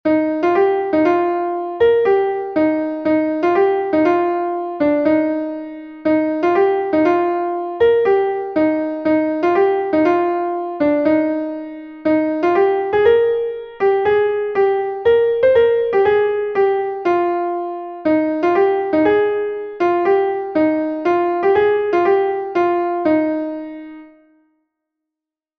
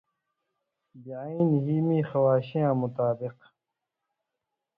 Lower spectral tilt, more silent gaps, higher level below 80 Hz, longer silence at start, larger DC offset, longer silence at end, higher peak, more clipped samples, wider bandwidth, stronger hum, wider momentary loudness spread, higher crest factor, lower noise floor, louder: second, -7.5 dB/octave vs -12 dB/octave; neither; first, -54 dBFS vs -70 dBFS; second, 0.05 s vs 0.95 s; neither; about the same, 1.5 s vs 1.45 s; first, -2 dBFS vs -12 dBFS; neither; first, 6.2 kHz vs 5 kHz; neither; second, 8 LU vs 14 LU; about the same, 14 dB vs 16 dB; about the same, -86 dBFS vs -86 dBFS; first, -17 LUFS vs -26 LUFS